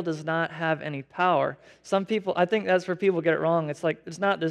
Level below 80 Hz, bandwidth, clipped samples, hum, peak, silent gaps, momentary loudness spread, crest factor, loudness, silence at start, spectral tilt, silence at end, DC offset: -74 dBFS; 11 kHz; under 0.1%; none; -10 dBFS; none; 6 LU; 16 dB; -26 LUFS; 0 s; -6 dB/octave; 0 s; under 0.1%